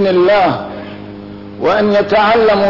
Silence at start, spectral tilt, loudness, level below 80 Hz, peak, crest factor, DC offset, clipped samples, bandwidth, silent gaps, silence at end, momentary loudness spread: 0 s; -7 dB/octave; -12 LUFS; -44 dBFS; -4 dBFS; 8 dB; 0.3%; under 0.1%; 6 kHz; none; 0 s; 20 LU